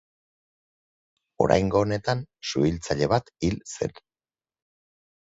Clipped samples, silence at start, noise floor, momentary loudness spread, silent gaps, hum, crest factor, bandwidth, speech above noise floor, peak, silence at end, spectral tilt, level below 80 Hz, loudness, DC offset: under 0.1%; 1.4 s; under -90 dBFS; 10 LU; none; none; 24 dB; 8 kHz; over 65 dB; -4 dBFS; 1.4 s; -6 dB/octave; -48 dBFS; -25 LUFS; under 0.1%